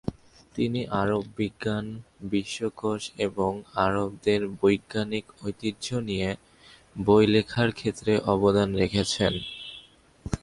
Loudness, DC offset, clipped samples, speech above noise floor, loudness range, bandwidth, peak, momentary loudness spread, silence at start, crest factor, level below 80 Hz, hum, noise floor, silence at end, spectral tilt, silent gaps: -26 LUFS; under 0.1%; under 0.1%; 27 dB; 5 LU; 11.5 kHz; -8 dBFS; 15 LU; 0.05 s; 20 dB; -50 dBFS; none; -53 dBFS; 0.05 s; -5.5 dB/octave; none